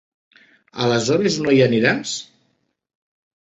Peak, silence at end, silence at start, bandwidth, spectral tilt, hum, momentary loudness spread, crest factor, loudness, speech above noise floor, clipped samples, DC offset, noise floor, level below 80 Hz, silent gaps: -2 dBFS; 1.2 s; 0.75 s; 8.2 kHz; -5 dB/octave; none; 13 LU; 20 dB; -18 LUFS; 50 dB; under 0.1%; under 0.1%; -68 dBFS; -60 dBFS; none